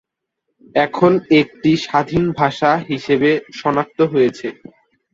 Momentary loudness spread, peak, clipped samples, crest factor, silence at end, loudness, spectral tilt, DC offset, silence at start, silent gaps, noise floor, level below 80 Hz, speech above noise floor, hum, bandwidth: 6 LU; 0 dBFS; under 0.1%; 16 dB; 0.6 s; -16 LUFS; -6.5 dB/octave; under 0.1%; 0.75 s; none; -75 dBFS; -50 dBFS; 59 dB; none; 7.6 kHz